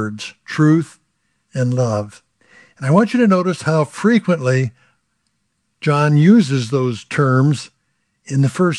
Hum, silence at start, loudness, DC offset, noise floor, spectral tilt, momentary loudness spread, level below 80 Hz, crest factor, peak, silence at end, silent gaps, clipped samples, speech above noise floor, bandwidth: none; 0 s; -16 LUFS; under 0.1%; -69 dBFS; -7 dB/octave; 13 LU; -66 dBFS; 16 dB; 0 dBFS; 0 s; none; under 0.1%; 54 dB; 11 kHz